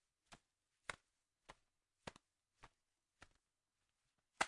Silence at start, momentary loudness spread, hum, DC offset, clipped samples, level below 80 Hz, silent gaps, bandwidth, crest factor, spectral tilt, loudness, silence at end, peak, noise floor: 0.3 s; 16 LU; none; under 0.1%; under 0.1%; -80 dBFS; none; 11 kHz; 32 dB; -1.5 dB/octave; -60 LUFS; 0 s; -24 dBFS; under -90 dBFS